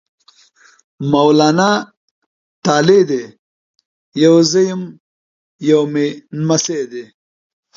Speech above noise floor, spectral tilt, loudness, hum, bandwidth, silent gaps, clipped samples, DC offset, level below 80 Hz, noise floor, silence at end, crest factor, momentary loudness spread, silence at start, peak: 37 dB; -5 dB/octave; -14 LUFS; none; 7.6 kHz; 1.97-2.63 s, 3.39-3.74 s, 3.85-4.12 s, 5.00-5.59 s; under 0.1%; under 0.1%; -62 dBFS; -50 dBFS; 0.75 s; 16 dB; 16 LU; 1 s; 0 dBFS